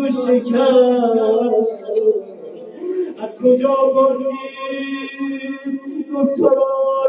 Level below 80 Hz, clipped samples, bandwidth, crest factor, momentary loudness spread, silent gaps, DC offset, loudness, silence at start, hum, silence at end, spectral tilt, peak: -72 dBFS; under 0.1%; 5 kHz; 16 dB; 12 LU; none; under 0.1%; -17 LUFS; 0 s; none; 0 s; -11 dB/octave; -2 dBFS